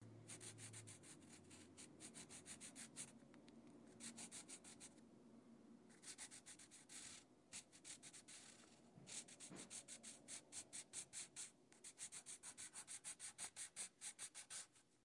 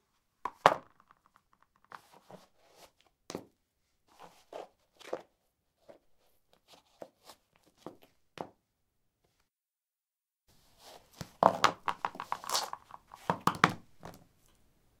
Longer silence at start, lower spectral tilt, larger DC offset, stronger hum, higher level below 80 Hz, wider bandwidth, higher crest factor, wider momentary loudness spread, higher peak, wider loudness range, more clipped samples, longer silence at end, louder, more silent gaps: second, 0 s vs 0.45 s; second, -1.5 dB/octave vs -3.5 dB/octave; neither; neither; second, under -90 dBFS vs -72 dBFS; second, 12 kHz vs 16 kHz; second, 22 dB vs 38 dB; second, 13 LU vs 26 LU; second, -38 dBFS vs -2 dBFS; second, 6 LU vs 23 LU; neither; second, 0 s vs 0.9 s; second, -56 LUFS vs -32 LUFS; neither